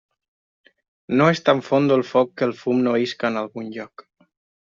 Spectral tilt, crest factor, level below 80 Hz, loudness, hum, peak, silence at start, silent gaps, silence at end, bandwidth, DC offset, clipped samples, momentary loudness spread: -5 dB/octave; 18 dB; -66 dBFS; -20 LUFS; none; -4 dBFS; 1.1 s; none; 0.8 s; 7.6 kHz; under 0.1%; under 0.1%; 15 LU